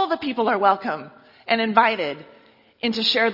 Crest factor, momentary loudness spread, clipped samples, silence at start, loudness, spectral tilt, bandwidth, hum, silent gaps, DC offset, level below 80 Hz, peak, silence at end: 22 dB; 13 LU; under 0.1%; 0 s; -21 LUFS; -4.5 dB/octave; 5.8 kHz; none; none; under 0.1%; -68 dBFS; 0 dBFS; 0 s